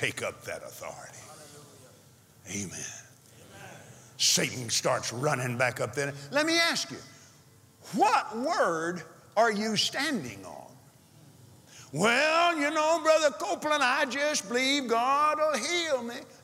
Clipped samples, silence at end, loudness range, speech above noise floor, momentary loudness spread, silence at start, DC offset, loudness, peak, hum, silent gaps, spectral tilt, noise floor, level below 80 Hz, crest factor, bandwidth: under 0.1%; 0.15 s; 8 LU; 29 dB; 20 LU; 0 s; under 0.1%; -27 LUFS; -10 dBFS; none; none; -2.5 dB/octave; -57 dBFS; -76 dBFS; 18 dB; 16.5 kHz